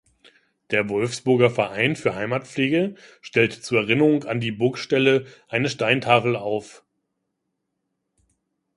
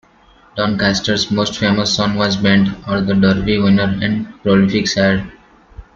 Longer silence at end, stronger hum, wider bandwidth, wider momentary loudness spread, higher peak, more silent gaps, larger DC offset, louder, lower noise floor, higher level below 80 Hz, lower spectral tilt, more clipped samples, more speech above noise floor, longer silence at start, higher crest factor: first, 2.05 s vs 0.15 s; neither; first, 11.5 kHz vs 7.6 kHz; about the same, 8 LU vs 7 LU; about the same, -2 dBFS vs -2 dBFS; neither; neither; second, -22 LUFS vs -15 LUFS; first, -78 dBFS vs -48 dBFS; second, -62 dBFS vs -40 dBFS; about the same, -5.5 dB/octave vs -5.5 dB/octave; neither; first, 56 dB vs 34 dB; first, 0.7 s vs 0.55 s; first, 22 dB vs 14 dB